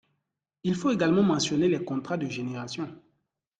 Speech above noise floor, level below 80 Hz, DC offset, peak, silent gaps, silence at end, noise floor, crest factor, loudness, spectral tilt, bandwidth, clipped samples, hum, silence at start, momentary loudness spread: 55 dB; -64 dBFS; under 0.1%; -12 dBFS; none; 0.6 s; -82 dBFS; 16 dB; -27 LUFS; -5.5 dB/octave; 9.4 kHz; under 0.1%; none; 0.65 s; 12 LU